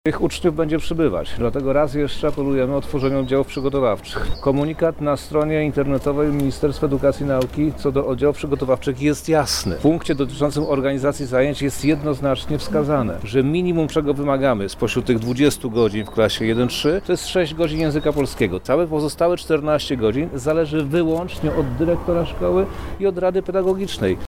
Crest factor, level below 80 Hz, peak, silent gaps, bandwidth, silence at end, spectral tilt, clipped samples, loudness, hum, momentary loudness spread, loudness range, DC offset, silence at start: 14 dB; -36 dBFS; -6 dBFS; none; 16.5 kHz; 0 s; -6 dB/octave; under 0.1%; -20 LUFS; none; 3 LU; 1 LU; under 0.1%; 0.05 s